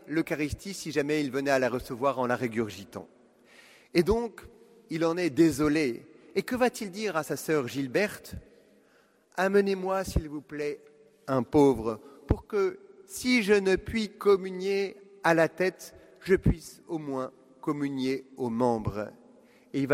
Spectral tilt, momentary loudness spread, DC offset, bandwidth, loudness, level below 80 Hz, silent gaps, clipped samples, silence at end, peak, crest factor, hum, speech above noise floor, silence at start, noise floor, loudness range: -5.5 dB/octave; 15 LU; under 0.1%; 16 kHz; -28 LUFS; -46 dBFS; none; under 0.1%; 0 s; -8 dBFS; 22 dB; none; 36 dB; 0.05 s; -64 dBFS; 4 LU